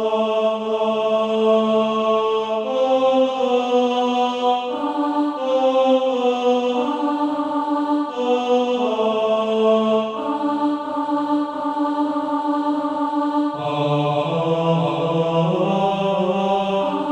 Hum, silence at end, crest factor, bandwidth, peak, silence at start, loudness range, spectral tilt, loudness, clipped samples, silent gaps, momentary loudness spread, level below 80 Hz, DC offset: none; 0 s; 14 dB; 8.8 kHz; -6 dBFS; 0 s; 3 LU; -7 dB/octave; -20 LUFS; under 0.1%; none; 5 LU; -64 dBFS; under 0.1%